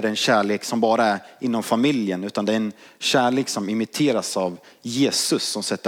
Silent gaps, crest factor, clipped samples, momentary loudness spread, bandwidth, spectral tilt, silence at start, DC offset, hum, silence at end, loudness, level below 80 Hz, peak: none; 16 dB; under 0.1%; 7 LU; 17 kHz; -3.5 dB/octave; 0 s; under 0.1%; none; 0 s; -22 LUFS; -76 dBFS; -6 dBFS